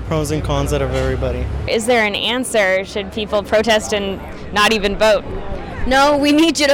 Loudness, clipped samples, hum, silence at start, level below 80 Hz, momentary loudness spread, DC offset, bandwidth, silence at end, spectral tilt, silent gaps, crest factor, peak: -16 LUFS; under 0.1%; none; 0 s; -30 dBFS; 11 LU; under 0.1%; 19 kHz; 0 s; -4.5 dB/octave; none; 10 dB; -6 dBFS